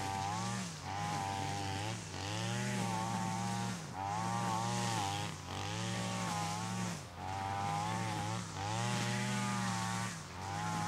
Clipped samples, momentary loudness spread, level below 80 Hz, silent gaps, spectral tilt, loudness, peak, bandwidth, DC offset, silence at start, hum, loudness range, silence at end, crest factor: under 0.1%; 5 LU; -66 dBFS; none; -4 dB/octave; -38 LUFS; -22 dBFS; 16 kHz; under 0.1%; 0 s; none; 1 LU; 0 s; 16 dB